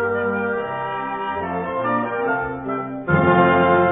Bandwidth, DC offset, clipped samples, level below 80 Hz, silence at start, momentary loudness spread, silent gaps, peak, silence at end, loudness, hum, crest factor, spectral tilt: 3.8 kHz; under 0.1%; under 0.1%; -50 dBFS; 0 s; 10 LU; none; -2 dBFS; 0 s; -20 LUFS; none; 18 dB; -11 dB/octave